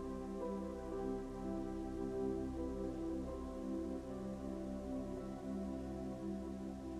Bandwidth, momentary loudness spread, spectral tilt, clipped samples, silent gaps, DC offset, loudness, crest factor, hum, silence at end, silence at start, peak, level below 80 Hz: 13.5 kHz; 4 LU; -8 dB/octave; under 0.1%; none; under 0.1%; -44 LUFS; 14 dB; none; 0 s; 0 s; -30 dBFS; -54 dBFS